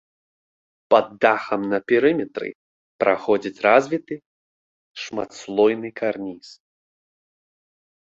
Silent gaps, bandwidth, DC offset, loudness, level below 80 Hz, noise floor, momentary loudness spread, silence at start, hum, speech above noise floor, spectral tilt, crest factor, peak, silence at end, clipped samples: 2.55-2.99 s, 4.26-4.95 s; 7.8 kHz; under 0.1%; -21 LUFS; -66 dBFS; under -90 dBFS; 17 LU; 0.9 s; none; over 69 dB; -5.5 dB/octave; 22 dB; -2 dBFS; 1.5 s; under 0.1%